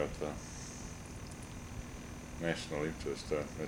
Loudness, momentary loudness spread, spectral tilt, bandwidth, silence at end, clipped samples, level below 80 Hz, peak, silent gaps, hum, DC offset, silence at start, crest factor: -41 LUFS; 9 LU; -5 dB/octave; 20 kHz; 0 s; under 0.1%; -52 dBFS; -20 dBFS; none; none; under 0.1%; 0 s; 20 dB